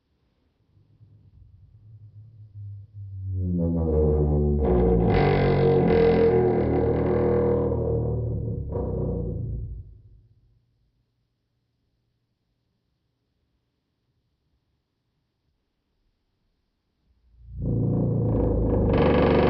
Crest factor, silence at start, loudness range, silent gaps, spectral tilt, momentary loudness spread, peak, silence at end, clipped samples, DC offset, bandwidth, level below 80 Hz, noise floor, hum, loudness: 18 dB; 1.95 s; 15 LU; none; -11.5 dB/octave; 17 LU; -8 dBFS; 0 s; under 0.1%; under 0.1%; 5.6 kHz; -36 dBFS; -75 dBFS; none; -23 LUFS